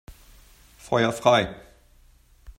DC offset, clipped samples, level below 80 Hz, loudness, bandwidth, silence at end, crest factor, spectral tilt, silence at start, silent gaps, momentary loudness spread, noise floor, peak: under 0.1%; under 0.1%; -52 dBFS; -22 LUFS; 16 kHz; 0.05 s; 24 dB; -5 dB/octave; 0.1 s; none; 14 LU; -56 dBFS; -4 dBFS